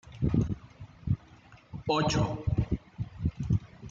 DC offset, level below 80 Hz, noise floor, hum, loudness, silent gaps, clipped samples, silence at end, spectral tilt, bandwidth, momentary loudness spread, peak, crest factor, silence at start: under 0.1%; -42 dBFS; -55 dBFS; none; -32 LUFS; none; under 0.1%; 0 s; -6.5 dB/octave; 7.8 kHz; 13 LU; -12 dBFS; 18 dB; 0.05 s